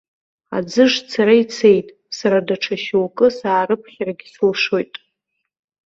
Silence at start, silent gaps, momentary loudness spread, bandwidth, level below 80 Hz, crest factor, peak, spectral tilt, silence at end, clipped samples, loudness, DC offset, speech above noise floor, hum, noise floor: 0.5 s; none; 12 LU; 7.8 kHz; -62 dBFS; 16 dB; -2 dBFS; -5 dB/octave; 1 s; under 0.1%; -17 LUFS; under 0.1%; 59 dB; none; -76 dBFS